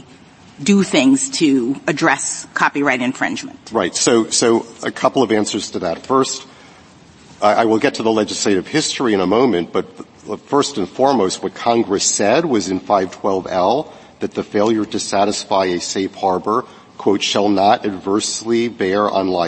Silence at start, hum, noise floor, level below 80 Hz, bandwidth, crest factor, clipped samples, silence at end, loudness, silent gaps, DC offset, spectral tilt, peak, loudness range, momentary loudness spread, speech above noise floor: 0.6 s; none; -44 dBFS; -58 dBFS; 8.8 kHz; 18 dB; under 0.1%; 0 s; -17 LUFS; none; under 0.1%; -3.5 dB/octave; 0 dBFS; 2 LU; 8 LU; 28 dB